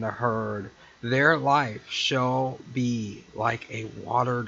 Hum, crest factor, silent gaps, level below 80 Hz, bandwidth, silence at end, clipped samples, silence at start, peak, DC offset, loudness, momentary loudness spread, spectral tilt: none; 20 dB; none; -62 dBFS; 7.8 kHz; 0 s; under 0.1%; 0 s; -6 dBFS; under 0.1%; -26 LUFS; 15 LU; -5 dB/octave